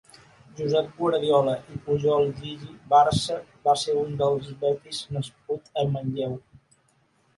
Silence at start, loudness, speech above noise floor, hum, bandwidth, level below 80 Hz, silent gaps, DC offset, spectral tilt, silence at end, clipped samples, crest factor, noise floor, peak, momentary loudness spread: 0.55 s; -25 LUFS; 41 dB; none; 11.5 kHz; -56 dBFS; none; under 0.1%; -6 dB/octave; 1 s; under 0.1%; 18 dB; -65 dBFS; -8 dBFS; 11 LU